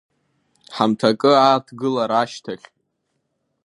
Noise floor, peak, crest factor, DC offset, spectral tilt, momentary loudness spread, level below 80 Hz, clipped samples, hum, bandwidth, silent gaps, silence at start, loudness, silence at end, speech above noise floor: -73 dBFS; 0 dBFS; 20 dB; under 0.1%; -5.5 dB/octave; 19 LU; -70 dBFS; under 0.1%; none; 11.5 kHz; none; 0.7 s; -18 LUFS; 1.1 s; 55 dB